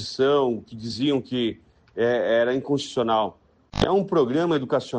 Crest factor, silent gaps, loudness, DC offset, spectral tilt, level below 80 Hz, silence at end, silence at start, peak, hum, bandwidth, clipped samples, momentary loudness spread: 16 dB; none; -23 LUFS; under 0.1%; -6 dB/octave; -48 dBFS; 0 s; 0 s; -8 dBFS; none; 9.4 kHz; under 0.1%; 9 LU